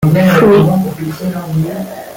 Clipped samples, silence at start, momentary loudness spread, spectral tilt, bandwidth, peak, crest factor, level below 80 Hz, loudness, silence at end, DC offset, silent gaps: under 0.1%; 0 s; 12 LU; -7.5 dB/octave; 17 kHz; 0 dBFS; 10 dB; -42 dBFS; -12 LUFS; 0 s; under 0.1%; none